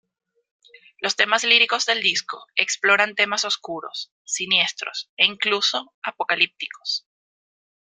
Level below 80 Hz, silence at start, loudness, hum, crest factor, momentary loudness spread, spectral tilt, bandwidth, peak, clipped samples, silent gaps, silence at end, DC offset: -74 dBFS; 1 s; -20 LUFS; none; 24 dB; 14 LU; 0 dB/octave; 14 kHz; 0 dBFS; under 0.1%; 4.12-4.25 s, 5.09-5.17 s, 5.94-6.02 s; 0.95 s; under 0.1%